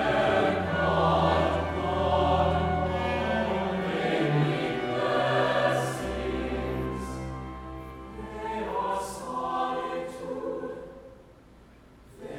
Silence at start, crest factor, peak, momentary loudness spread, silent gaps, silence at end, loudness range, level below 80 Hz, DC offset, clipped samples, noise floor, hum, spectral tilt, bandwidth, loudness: 0 s; 18 dB; -10 dBFS; 15 LU; none; 0 s; 8 LU; -46 dBFS; under 0.1%; under 0.1%; -53 dBFS; none; -6 dB/octave; 15.5 kHz; -28 LUFS